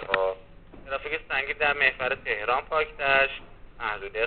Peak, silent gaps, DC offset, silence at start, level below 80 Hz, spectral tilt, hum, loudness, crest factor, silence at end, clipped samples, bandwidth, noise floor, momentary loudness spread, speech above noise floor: -4 dBFS; none; 0.2%; 0 s; -50 dBFS; 0.5 dB/octave; none; -26 LUFS; 24 dB; 0 s; under 0.1%; 4.6 kHz; -47 dBFS; 12 LU; 21 dB